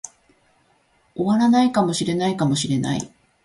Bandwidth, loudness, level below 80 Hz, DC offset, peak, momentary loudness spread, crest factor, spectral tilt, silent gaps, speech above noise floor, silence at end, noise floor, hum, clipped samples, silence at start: 11.5 kHz; -20 LUFS; -58 dBFS; under 0.1%; -6 dBFS; 18 LU; 16 dB; -5.5 dB/octave; none; 42 dB; 0.35 s; -61 dBFS; none; under 0.1%; 0.05 s